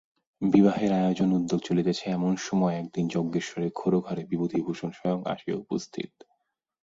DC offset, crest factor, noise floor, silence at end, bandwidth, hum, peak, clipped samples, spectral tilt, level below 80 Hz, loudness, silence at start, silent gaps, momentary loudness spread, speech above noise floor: under 0.1%; 20 dB; -75 dBFS; 0.75 s; 7.8 kHz; none; -6 dBFS; under 0.1%; -7 dB/octave; -64 dBFS; -27 LUFS; 0.4 s; none; 10 LU; 49 dB